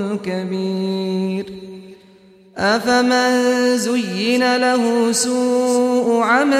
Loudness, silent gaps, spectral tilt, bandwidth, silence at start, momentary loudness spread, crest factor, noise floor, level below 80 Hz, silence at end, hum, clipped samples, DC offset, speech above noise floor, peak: -17 LUFS; none; -4 dB/octave; 15 kHz; 0 s; 8 LU; 14 dB; -47 dBFS; -60 dBFS; 0 s; none; under 0.1%; under 0.1%; 30 dB; -4 dBFS